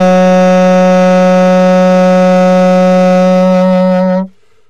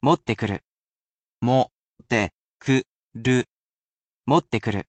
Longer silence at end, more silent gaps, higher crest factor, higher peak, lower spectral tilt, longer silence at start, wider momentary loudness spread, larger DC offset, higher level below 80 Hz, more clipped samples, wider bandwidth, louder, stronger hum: first, 0.4 s vs 0.05 s; second, none vs 0.65-1.38 s, 1.73-1.96 s, 2.33-2.58 s, 2.90-3.09 s, 3.52-4.20 s; second, 6 dB vs 18 dB; first, 0 dBFS vs -6 dBFS; first, -7.5 dB/octave vs -6 dB/octave; about the same, 0 s vs 0.05 s; second, 3 LU vs 12 LU; first, 3% vs under 0.1%; first, -48 dBFS vs -56 dBFS; neither; about the same, 8.6 kHz vs 8.8 kHz; first, -7 LUFS vs -24 LUFS; neither